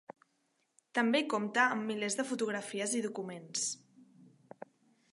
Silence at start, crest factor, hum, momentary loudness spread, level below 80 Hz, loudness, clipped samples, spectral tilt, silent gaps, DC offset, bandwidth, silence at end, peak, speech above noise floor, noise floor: 0.95 s; 22 dB; none; 20 LU; -88 dBFS; -34 LUFS; under 0.1%; -2.5 dB/octave; none; under 0.1%; 11.5 kHz; 0.5 s; -14 dBFS; 44 dB; -78 dBFS